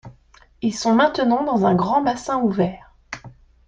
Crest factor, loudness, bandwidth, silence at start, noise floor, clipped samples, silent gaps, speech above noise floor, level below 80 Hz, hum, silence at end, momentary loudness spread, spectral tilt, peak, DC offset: 16 dB; -20 LUFS; 9.2 kHz; 0.05 s; -53 dBFS; under 0.1%; none; 34 dB; -52 dBFS; none; 0.35 s; 19 LU; -6 dB/octave; -4 dBFS; under 0.1%